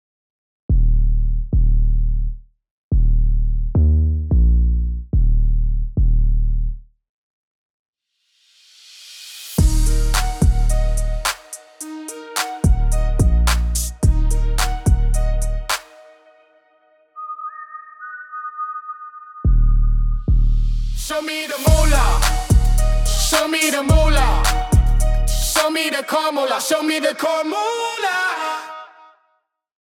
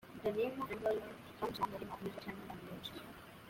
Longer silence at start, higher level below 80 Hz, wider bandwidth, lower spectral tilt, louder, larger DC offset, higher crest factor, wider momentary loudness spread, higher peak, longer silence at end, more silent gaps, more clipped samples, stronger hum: first, 0.7 s vs 0 s; first, -18 dBFS vs -68 dBFS; about the same, 17 kHz vs 16.5 kHz; about the same, -4.5 dB/octave vs -5.5 dB/octave; first, -20 LUFS vs -42 LUFS; neither; about the same, 14 dB vs 18 dB; first, 15 LU vs 11 LU; first, -2 dBFS vs -24 dBFS; first, 1.15 s vs 0 s; first, 2.71-2.91 s, 7.09-7.93 s vs none; neither; neither